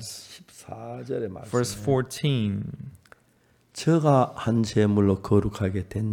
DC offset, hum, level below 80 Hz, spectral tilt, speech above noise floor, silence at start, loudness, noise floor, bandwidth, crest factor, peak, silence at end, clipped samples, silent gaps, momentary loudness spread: under 0.1%; none; -52 dBFS; -6.5 dB/octave; 39 dB; 0 s; -25 LUFS; -63 dBFS; 16.5 kHz; 18 dB; -6 dBFS; 0 s; under 0.1%; none; 20 LU